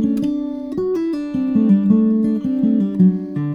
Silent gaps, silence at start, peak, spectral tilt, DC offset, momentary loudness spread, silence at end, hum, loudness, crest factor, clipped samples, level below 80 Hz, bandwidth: none; 0 s; -2 dBFS; -10.5 dB/octave; under 0.1%; 8 LU; 0 s; none; -18 LUFS; 14 dB; under 0.1%; -52 dBFS; 6.4 kHz